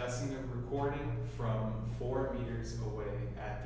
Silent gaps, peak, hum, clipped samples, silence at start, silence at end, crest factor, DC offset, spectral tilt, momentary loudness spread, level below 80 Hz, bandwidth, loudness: none; -22 dBFS; none; under 0.1%; 0 s; 0 s; 16 dB; under 0.1%; -7 dB/octave; 4 LU; -46 dBFS; 8 kHz; -38 LUFS